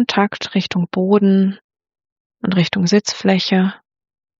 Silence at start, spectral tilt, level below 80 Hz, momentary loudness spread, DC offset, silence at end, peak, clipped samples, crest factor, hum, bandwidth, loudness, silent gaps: 0 s; -5.5 dB/octave; -62 dBFS; 7 LU; under 0.1%; 0.65 s; -2 dBFS; under 0.1%; 16 dB; none; 7.6 kHz; -17 LUFS; 1.64-1.69 s, 2.12-2.30 s